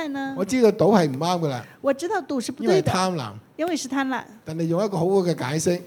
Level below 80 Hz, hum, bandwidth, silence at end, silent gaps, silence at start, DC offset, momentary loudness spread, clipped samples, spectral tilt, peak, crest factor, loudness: -58 dBFS; none; 19.5 kHz; 0 s; none; 0 s; under 0.1%; 10 LU; under 0.1%; -5.5 dB/octave; -4 dBFS; 20 dB; -23 LUFS